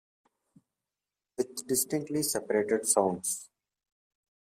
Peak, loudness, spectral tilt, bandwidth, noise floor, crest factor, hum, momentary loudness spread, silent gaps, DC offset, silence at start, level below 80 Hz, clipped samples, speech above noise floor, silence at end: -10 dBFS; -29 LUFS; -3 dB/octave; 16 kHz; under -90 dBFS; 24 dB; none; 10 LU; none; under 0.1%; 1.4 s; -74 dBFS; under 0.1%; over 60 dB; 1.15 s